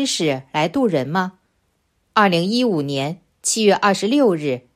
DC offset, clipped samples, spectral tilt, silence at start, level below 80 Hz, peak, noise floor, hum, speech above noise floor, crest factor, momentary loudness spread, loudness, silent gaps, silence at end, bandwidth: under 0.1%; under 0.1%; -4 dB/octave; 0 s; -62 dBFS; 0 dBFS; -67 dBFS; none; 48 dB; 18 dB; 8 LU; -19 LUFS; none; 0.15 s; 15.5 kHz